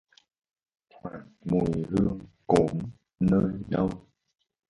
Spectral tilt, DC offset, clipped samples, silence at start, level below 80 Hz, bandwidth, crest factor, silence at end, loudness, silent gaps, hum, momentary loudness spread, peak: -8.5 dB/octave; under 0.1%; under 0.1%; 1.05 s; -50 dBFS; 11.5 kHz; 22 dB; 0.7 s; -27 LUFS; none; none; 18 LU; -6 dBFS